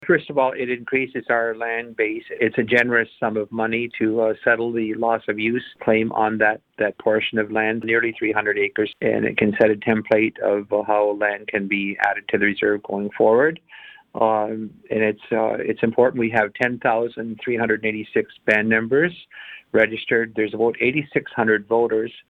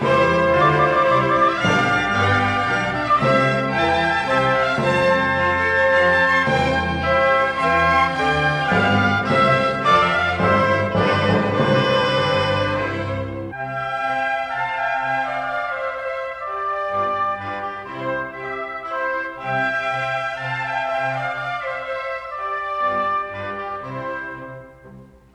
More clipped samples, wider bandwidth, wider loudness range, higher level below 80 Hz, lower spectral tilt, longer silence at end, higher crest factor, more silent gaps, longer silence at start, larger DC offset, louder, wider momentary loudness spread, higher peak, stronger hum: neither; second, 6.8 kHz vs 11 kHz; second, 1 LU vs 8 LU; second, -60 dBFS vs -44 dBFS; first, -7.5 dB/octave vs -6 dB/octave; second, 0.1 s vs 0.3 s; about the same, 18 dB vs 16 dB; neither; about the same, 0 s vs 0 s; neither; about the same, -21 LUFS vs -19 LUFS; second, 7 LU vs 11 LU; about the same, -2 dBFS vs -4 dBFS; neither